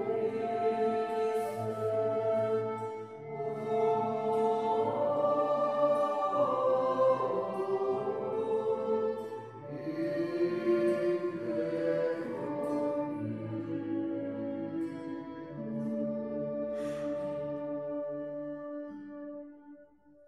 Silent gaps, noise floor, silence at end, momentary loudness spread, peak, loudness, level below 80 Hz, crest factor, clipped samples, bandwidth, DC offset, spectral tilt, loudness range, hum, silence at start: none; -59 dBFS; 0.45 s; 12 LU; -16 dBFS; -32 LUFS; -76 dBFS; 16 dB; under 0.1%; 12.5 kHz; under 0.1%; -7.5 dB/octave; 7 LU; none; 0 s